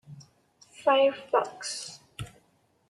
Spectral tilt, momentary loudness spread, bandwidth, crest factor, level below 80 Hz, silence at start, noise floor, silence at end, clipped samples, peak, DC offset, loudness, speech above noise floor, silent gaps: -3 dB/octave; 20 LU; 12 kHz; 20 dB; -64 dBFS; 0.1 s; -68 dBFS; 0.6 s; under 0.1%; -10 dBFS; under 0.1%; -27 LUFS; 42 dB; none